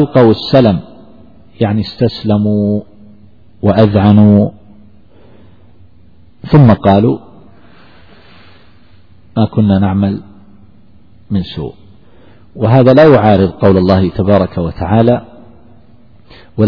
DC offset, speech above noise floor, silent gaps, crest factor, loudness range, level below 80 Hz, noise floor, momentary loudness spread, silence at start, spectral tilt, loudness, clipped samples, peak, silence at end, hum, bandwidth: 1%; 36 dB; none; 12 dB; 7 LU; -38 dBFS; -45 dBFS; 13 LU; 0 s; -10 dB/octave; -10 LUFS; 0.9%; 0 dBFS; 0 s; none; 5.4 kHz